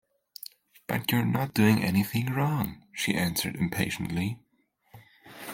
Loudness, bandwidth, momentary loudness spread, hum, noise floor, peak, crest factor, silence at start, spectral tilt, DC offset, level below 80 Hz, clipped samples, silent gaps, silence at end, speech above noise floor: -28 LUFS; 17 kHz; 20 LU; none; -70 dBFS; -10 dBFS; 20 dB; 0.9 s; -5.5 dB/octave; under 0.1%; -60 dBFS; under 0.1%; none; 0 s; 43 dB